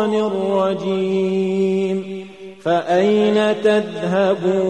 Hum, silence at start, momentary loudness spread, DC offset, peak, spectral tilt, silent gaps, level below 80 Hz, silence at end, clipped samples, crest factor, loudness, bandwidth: none; 0 s; 9 LU; 0.2%; -4 dBFS; -6.5 dB/octave; none; -64 dBFS; 0 s; under 0.1%; 14 dB; -18 LUFS; 9.2 kHz